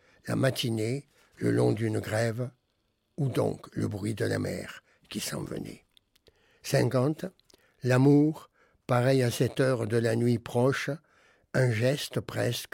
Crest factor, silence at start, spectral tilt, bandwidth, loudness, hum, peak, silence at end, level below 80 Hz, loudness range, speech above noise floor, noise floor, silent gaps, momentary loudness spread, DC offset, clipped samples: 18 dB; 0.25 s; -6 dB/octave; 17 kHz; -28 LUFS; none; -10 dBFS; 0.05 s; -64 dBFS; 7 LU; 48 dB; -75 dBFS; none; 15 LU; under 0.1%; under 0.1%